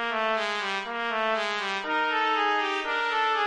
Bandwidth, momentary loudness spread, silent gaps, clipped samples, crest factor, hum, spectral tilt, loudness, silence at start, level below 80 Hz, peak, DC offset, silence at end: 11 kHz; 5 LU; none; under 0.1%; 14 dB; none; -2 dB/octave; -26 LUFS; 0 s; -66 dBFS; -12 dBFS; under 0.1%; 0 s